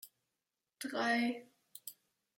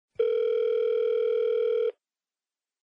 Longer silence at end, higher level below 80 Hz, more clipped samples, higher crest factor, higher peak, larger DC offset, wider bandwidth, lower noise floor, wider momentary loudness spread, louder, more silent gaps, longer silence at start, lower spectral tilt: second, 0.45 s vs 0.9 s; second, under -90 dBFS vs -80 dBFS; neither; first, 18 dB vs 12 dB; second, -22 dBFS vs -16 dBFS; neither; first, 16.5 kHz vs 5.2 kHz; about the same, -90 dBFS vs under -90 dBFS; first, 21 LU vs 2 LU; second, -36 LUFS vs -26 LUFS; neither; second, 0.05 s vs 0.2 s; about the same, -3 dB/octave vs -4 dB/octave